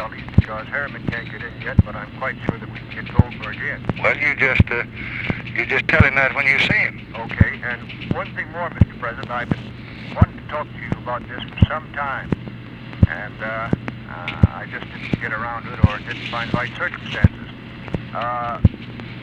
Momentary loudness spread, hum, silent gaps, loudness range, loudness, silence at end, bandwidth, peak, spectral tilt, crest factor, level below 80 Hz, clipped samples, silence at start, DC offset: 14 LU; none; none; 6 LU; -21 LUFS; 0 s; 7.6 kHz; 0 dBFS; -7.5 dB/octave; 20 dB; -32 dBFS; under 0.1%; 0 s; under 0.1%